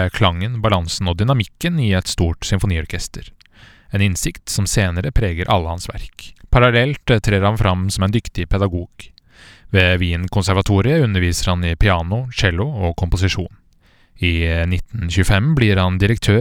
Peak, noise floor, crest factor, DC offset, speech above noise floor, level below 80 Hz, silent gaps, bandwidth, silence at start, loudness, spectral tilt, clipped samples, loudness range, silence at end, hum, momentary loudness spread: 0 dBFS; -53 dBFS; 18 dB; under 0.1%; 36 dB; -28 dBFS; none; 16.5 kHz; 0 s; -18 LUFS; -5.5 dB/octave; under 0.1%; 3 LU; 0 s; none; 8 LU